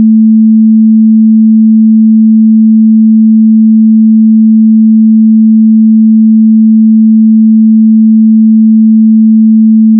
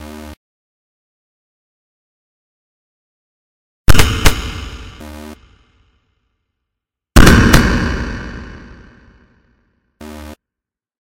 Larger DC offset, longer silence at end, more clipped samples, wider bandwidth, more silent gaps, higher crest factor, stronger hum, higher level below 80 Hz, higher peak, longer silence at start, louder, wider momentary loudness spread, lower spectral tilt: neither; about the same, 0 s vs 0.05 s; second, under 0.1% vs 0.6%; second, 0.3 kHz vs 17 kHz; second, none vs 0.37-3.85 s; second, 4 dB vs 16 dB; neither; second, -80 dBFS vs -22 dBFS; about the same, 0 dBFS vs 0 dBFS; about the same, 0 s vs 0 s; first, -4 LUFS vs -12 LUFS; second, 0 LU vs 26 LU; first, -20 dB/octave vs -4.5 dB/octave